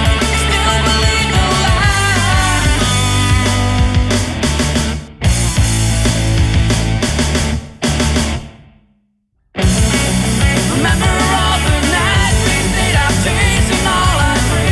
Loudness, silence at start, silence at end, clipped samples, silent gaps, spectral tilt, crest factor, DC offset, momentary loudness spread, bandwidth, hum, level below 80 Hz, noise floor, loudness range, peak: -13 LUFS; 0 s; 0 s; under 0.1%; none; -4 dB/octave; 12 dB; under 0.1%; 4 LU; 12 kHz; none; -20 dBFS; -61 dBFS; 4 LU; -2 dBFS